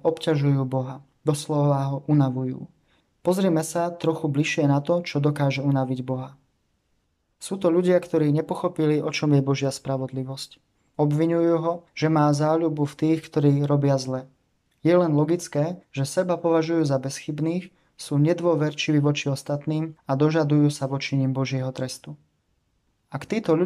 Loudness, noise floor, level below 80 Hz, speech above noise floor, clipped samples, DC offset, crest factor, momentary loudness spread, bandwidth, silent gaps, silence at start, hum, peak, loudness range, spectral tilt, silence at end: -24 LUFS; -70 dBFS; -66 dBFS; 48 dB; under 0.1%; under 0.1%; 16 dB; 11 LU; 13 kHz; none; 0.05 s; none; -8 dBFS; 3 LU; -7 dB/octave; 0 s